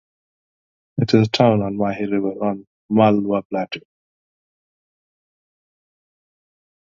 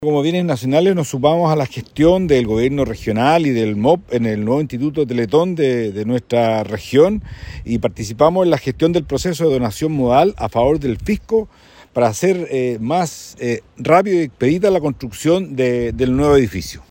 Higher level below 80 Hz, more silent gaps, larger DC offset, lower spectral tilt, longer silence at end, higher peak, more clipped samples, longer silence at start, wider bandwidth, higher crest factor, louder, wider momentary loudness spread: second, -56 dBFS vs -38 dBFS; first, 2.67-2.89 s, 3.45-3.50 s vs none; neither; about the same, -7.5 dB/octave vs -6.5 dB/octave; first, 3.05 s vs 0.1 s; about the same, 0 dBFS vs 0 dBFS; neither; first, 0.95 s vs 0 s; second, 7.4 kHz vs 16.5 kHz; first, 22 dB vs 16 dB; about the same, -19 LUFS vs -17 LUFS; first, 13 LU vs 8 LU